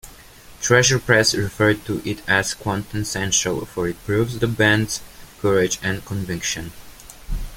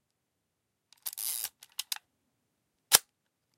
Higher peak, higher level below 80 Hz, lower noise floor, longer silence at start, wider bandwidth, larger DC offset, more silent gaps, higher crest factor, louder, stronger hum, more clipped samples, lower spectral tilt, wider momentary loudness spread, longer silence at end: about the same, -2 dBFS vs -2 dBFS; first, -38 dBFS vs -78 dBFS; second, -44 dBFS vs -82 dBFS; second, 0.05 s vs 1.05 s; about the same, 17 kHz vs 17 kHz; neither; neither; second, 20 dB vs 34 dB; first, -20 LUFS vs -29 LUFS; neither; neither; first, -3.5 dB/octave vs 2 dB/octave; second, 11 LU vs 16 LU; second, 0 s vs 0.6 s